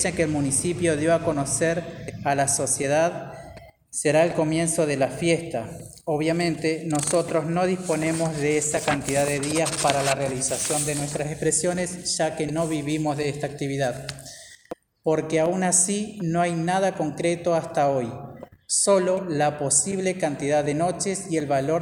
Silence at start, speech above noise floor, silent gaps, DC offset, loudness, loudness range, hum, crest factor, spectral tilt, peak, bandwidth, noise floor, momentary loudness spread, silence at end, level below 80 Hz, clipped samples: 0 s; 21 dB; none; under 0.1%; -23 LUFS; 2 LU; none; 22 dB; -4 dB/octave; -2 dBFS; over 20 kHz; -45 dBFS; 10 LU; 0 s; -54 dBFS; under 0.1%